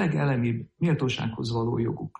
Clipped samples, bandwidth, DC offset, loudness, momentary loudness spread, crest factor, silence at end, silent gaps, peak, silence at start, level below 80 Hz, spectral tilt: under 0.1%; 8.4 kHz; under 0.1%; -27 LUFS; 4 LU; 12 dB; 0.1 s; none; -14 dBFS; 0 s; -54 dBFS; -7 dB/octave